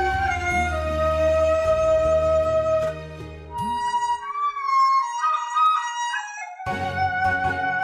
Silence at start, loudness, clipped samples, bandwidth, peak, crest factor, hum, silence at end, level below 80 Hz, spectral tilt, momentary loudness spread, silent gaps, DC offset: 0 s; -22 LUFS; under 0.1%; 11.5 kHz; -10 dBFS; 12 dB; none; 0 s; -40 dBFS; -4.5 dB/octave; 10 LU; none; under 0.1%